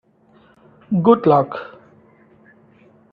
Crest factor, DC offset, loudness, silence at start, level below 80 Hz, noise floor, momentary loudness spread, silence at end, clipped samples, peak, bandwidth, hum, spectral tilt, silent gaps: 20 dB; under 0.1%; -16 LUFS; 0.9 s; -62 dBFS; -53 dBFS; 19 LU; 1.5 s; under 0.1%; 0 dBFS; 5 kHz; none; -11 dB/octave; none